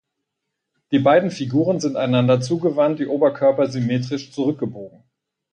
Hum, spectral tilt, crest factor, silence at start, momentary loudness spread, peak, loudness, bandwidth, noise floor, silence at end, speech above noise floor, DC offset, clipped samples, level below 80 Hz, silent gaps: none; -7 dB/octave; 16 dB; 0.9 s; 7 LU; -4 dBFS; -19 LUFS; 9.6 kHz; -79 dBFS; 0.65 s; 61 dB; under 0.1%; under 0.1%; -64 dBFS; none